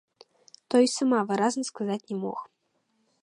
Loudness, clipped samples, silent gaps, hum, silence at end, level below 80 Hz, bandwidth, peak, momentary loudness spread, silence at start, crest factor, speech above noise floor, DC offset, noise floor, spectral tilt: -26 LUFS; under 0.1%; none; none; 0.75 s; -80 dBFS; 11 kHz; -10 dBFS; 10 LU; 0.7 s; 18 dB; 48 dB; under 0.1%; -74 dBFS; -4.5 dB/octave